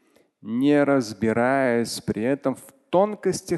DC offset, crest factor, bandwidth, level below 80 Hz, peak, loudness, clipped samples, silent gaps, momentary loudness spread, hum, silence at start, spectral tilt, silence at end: under 0.1%; 16 dB; 12.5 kHz; -58 dBFS; -6 dBFS; -23 LUFS; under 0.1%; none; 9 LU; none; 0.45 s; -5.5 dB/octave; 0 s